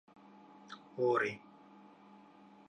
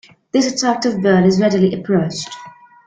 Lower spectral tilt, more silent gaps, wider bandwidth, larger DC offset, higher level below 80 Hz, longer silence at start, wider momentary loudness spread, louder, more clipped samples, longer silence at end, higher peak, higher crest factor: about the same, -6 dB/octave vs -5.5 dB/octave; neither; about the same, 9 kHz vs 9.2 kHz; neither; second, -84 dBFS vs -54 dBFS; first, 0.7 s vs 0.35 s; first, 27 LU vs 13 LU; second, -34 LUFS vs -16 LUFS; neither; first, 1.3 s vs 0.35 s; second, -20 dBFS vs -2 dBFS; first, 20 dB vs 14 dB